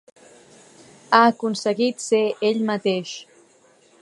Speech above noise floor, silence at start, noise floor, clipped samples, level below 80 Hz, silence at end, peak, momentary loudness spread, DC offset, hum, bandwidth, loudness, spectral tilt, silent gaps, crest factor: 36 dB; 1.1 s; -56 dBFS; under 0.1%; -76 dBFS; 0.8 s; 0 dBFS; 10 LU; under 0.1%; none; 11.5 kHz; -20 LUFS; -4 dB/octave; none; 22 dB